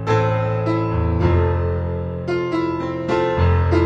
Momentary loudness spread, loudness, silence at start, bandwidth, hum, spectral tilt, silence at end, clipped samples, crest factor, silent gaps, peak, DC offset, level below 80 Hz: 6 LU; -20 LUFS; 0 s; 7.2 kHz; none; -8.5 dB/octave; 0 s; under 0.1%; 14 dB; none; -4 dBFS; under 0.1%; -30 dBFS